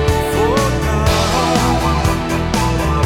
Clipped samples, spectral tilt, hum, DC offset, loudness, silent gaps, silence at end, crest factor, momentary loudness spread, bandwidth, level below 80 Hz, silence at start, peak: under 0.1%; -5 dB/octave; none; under 0.1%; -16 LUFS; none; 0 s; 14 dB; 2 LU; 17.5 kHz; -22 dBFS; 0 s; 0 dBFS